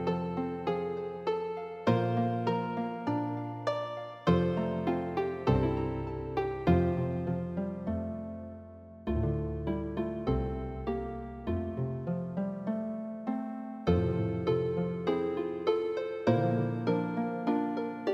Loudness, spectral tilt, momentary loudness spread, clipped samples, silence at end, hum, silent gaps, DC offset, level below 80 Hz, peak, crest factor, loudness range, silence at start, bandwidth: -32 LUFS; -9 dB/octave; 8 LU; under 0.1%; 0 s; none; none; under 0.1%; -46 dBFS; -12 dBFS; 20 dB; 4 LU; 0 s; 6.8 kHz